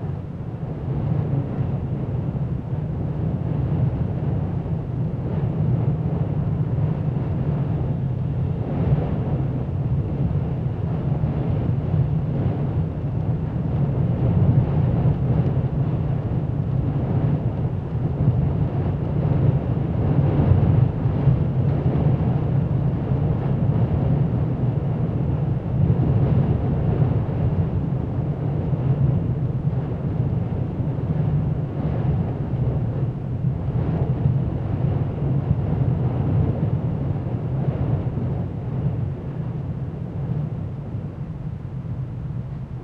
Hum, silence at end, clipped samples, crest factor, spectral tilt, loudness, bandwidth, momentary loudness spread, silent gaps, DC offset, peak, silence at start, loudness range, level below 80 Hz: none; 0 s; under 0.1%; 18 dB; -11.5 dB/octave; -23 LUFS; 4 kHz; 7 LU; none; under 0.1%; -4 dBFS; 0 s; 5 LU; -34 dBFS